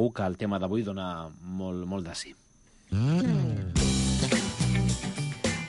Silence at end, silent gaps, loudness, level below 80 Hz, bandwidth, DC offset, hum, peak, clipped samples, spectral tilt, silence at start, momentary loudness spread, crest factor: 0 s; none; -29 LUFS; -40 dBFS; 11.5 kHz; under 0.1%; none; -12 dBFS; under 0.1%; -5 dB/octave; 0 s; 11 LU; 16 dB